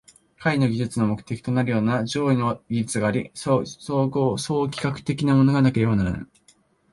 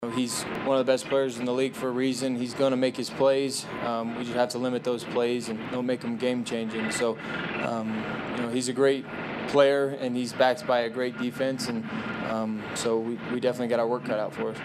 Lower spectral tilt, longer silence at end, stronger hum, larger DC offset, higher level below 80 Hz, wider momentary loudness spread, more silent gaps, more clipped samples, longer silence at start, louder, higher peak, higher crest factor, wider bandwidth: first, -6.5 dB/octave vs -4.5 dB/octave; first, 0.7 s vs 0 s; neither; neither; first, -48 dBFS vs -64 dBFS; about the same, 8 LU vs 7 LU; neither; neither; first, 0.4 s vs 0 s; first, -23 LUFS vs -27 LUFS; about the same, -6 dBFS vs -8 dBFS; about the same, 16 dB vs 20 dB; second, 11.5 kHz vs 14.5 kHz